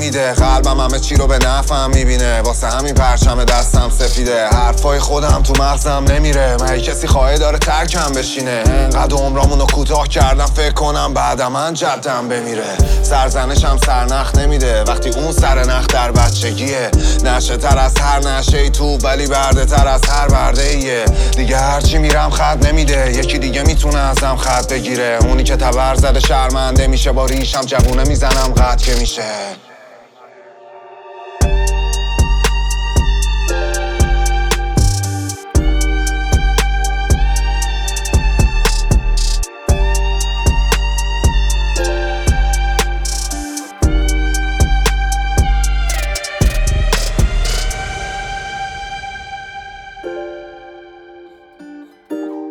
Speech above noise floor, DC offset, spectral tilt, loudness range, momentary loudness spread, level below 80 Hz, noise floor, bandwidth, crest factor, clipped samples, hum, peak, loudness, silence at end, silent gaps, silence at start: 29 dB; under 0.1%; -4.5 dB/octave; 5 LU; 7 LU; -14 dBFS; -41 dBFS; 15 kHz; 12 dB; under 0.1%; none; 0 dBFS; -15 LUFS; 0 s; none; 0 s